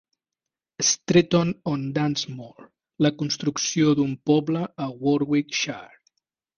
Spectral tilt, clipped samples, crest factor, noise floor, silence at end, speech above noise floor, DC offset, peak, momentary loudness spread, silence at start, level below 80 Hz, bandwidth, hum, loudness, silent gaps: -4.5 dB/octave; under 0.1%; 20 dB; -88 dBFS; 0.7 s; 65 dB; under 0.1%; -6 dBFS; 10 LU; 0.8 s; -60 dBFS; 10.5 kHz; none; -23 LUFS; none